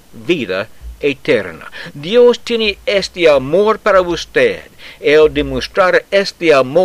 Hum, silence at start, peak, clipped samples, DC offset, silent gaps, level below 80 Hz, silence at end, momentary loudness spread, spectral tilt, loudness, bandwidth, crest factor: none; 0.15 s; 0 dBFS; under 0.1%; under 0.1%; none; -38 dBFS; 0 s; 11 LU; -4.5 dB/octave; -13 LUFS; 13.5 kHz; 12 dB